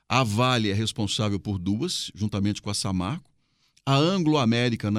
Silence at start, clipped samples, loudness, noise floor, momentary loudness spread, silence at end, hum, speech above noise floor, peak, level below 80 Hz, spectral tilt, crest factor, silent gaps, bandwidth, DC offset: 0.1 s; under 0.1%; -25 LUFS; -65 dBFS; 7 LU; 0 s; none; 41 dB; -6 dBFS; -56 dBFS; -5 dB/octave; 18 dB; none; 14.5 kHz; under 0.1%